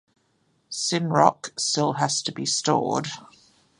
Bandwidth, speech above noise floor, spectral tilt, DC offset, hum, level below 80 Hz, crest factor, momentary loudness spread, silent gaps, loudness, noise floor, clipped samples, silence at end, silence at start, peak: 11.5 kHz; 44 dB; -3.5 dB/octave; under 0.1%; none; -68 dBFS; 24 dB; 11 LU; none; -23 LUFS; -68 dBFS; under 0.1%; 0.55 s; 0.7 s; -2 dBFS